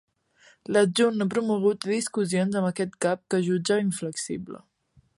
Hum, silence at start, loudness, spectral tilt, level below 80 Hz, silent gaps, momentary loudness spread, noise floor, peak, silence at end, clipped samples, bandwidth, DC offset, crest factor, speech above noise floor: none; 0.7 s; -25 LUFS; -5 dB/octave; -68 dBFS; none; 11 LU; -59 dBFS; -10 dBFS; 0.6 s; under 0.1%; 11.5 kHz; under 0.1%; 16 dB; 34 dB